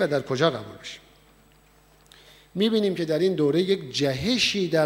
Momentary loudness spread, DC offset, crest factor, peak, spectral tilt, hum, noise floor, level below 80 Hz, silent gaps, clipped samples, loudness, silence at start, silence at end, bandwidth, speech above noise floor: 16 LU; under 0.1%; 20 dB; -6 dBFS; -5 dB/octave; none; -57 dBFS; -58 dBFS; none; under 0.1%; -24 LUFS; 0 s; 0 s; 16.5 kHz; 33 dB